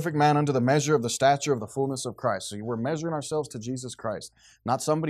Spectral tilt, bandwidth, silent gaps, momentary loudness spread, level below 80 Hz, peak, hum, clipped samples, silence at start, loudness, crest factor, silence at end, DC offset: -5 dB/octave; 14 kHz; none; 12 LU; -66 dBFS; -10 dBFS; none; under 0.1%; 0 s; -27 LUFS; 18 dB; 0 s; under 0.1%